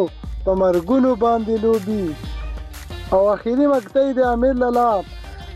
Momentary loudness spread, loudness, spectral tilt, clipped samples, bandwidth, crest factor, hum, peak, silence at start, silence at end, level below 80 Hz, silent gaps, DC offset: 15 LU; -18 LUFS; -7.5 dB/octave; under 0.1%; 14.5 kHz; 14 dB; none; -6 dBFS; 0 s; 0 s; -34 dBFS; none; under 0.1%